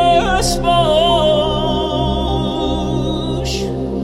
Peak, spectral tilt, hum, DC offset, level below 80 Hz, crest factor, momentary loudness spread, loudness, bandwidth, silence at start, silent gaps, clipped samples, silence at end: -2 dBFS; -5 dB/octave; none; under 0.1%; -26 dBFS; 14 dB; 7 LU; -16 LUFS; 15.5 kHz; 0 s; none; under 0.1%; 0 s